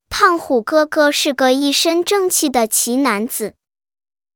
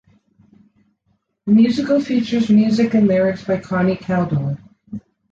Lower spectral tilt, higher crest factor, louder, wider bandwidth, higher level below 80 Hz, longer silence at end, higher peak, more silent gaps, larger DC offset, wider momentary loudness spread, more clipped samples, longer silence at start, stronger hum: second, -1.5 dB/octave vs -8 dB/octave; about the same, 16 dB vs 14 dB; about the same, -15 LUFS vs -17 LUFS; first, 20 kHz vs 7.6 kHz; about the same, -52 dBFS vs -54 dBFS; first, 0.85 s vs 0.35 s; first, 0 dBFS vs -4 dBFS; neither; neither; second, 5 LU vs 18 LU; neither; second, 0.1 s vs 1.45 s; neither